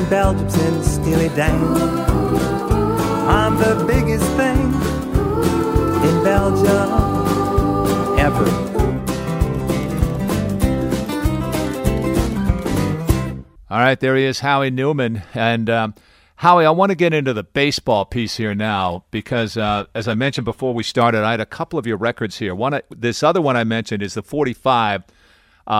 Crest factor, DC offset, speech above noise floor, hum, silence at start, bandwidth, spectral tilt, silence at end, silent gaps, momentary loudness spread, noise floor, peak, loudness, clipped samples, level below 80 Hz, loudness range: 18 dB; under 0.1%; 36 dB; none; 0 s; 16 kHz; -6 dB/octave; 0 s; none; 7 LU; -53 dBFS; 0 dBFS; -18 LUFS; under 0.1%; -28 dBFS; 3 LU